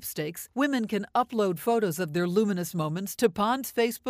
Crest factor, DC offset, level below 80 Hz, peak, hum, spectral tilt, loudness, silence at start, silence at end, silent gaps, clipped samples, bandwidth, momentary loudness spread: 18 dB; under 0.1%; -66 dBFS; -8 dBFS; none; -5 dB/octave; -28 LUFS; 0 s; 0 s; none; under 0.1%; 16 kHz; 5 LU